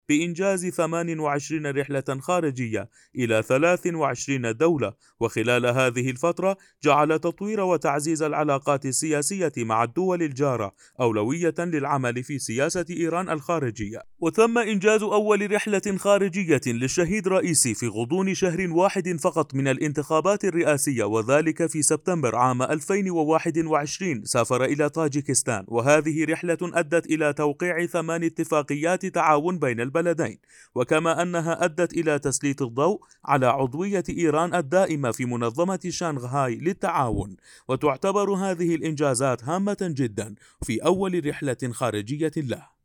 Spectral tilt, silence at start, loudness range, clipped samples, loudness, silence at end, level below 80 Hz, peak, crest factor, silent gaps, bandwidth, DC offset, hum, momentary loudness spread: -5 dB/octave; 0.1 s; 3 LU; under 0.1%; -24 LUFS; 0.25 s; -56 dBFS; -4 dBFS; 20 dB; none; 18.5 kHz; under 0.1%; none; 7 LU